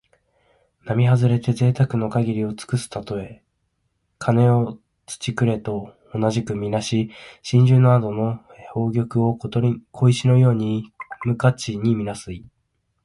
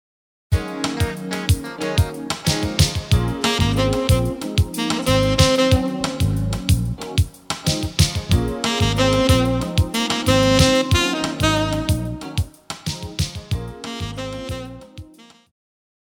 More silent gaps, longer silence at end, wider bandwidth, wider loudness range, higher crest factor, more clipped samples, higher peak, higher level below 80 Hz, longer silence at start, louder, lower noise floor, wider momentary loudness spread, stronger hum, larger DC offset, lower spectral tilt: neither; second, 0.65 s vs 1 s; second, 11.5 kHz vs 17.5 kHz; second, 4 LU vs 9 LU; about the same, 16 dB vs 18 dB; neither; about the same, -4 dBFS vs -2 dBFS; second, -52 dBFS vs -30 dBFS; first, 0.85 s vs 0.5 s; about the same, -21 LUFS vs -20 LUFS; first, -71 dBFS vs -45 dBFS; about the same, 15 LU vs 13 LU; neither; neither; first, -7.5 dB/octave vs -5 dB/octave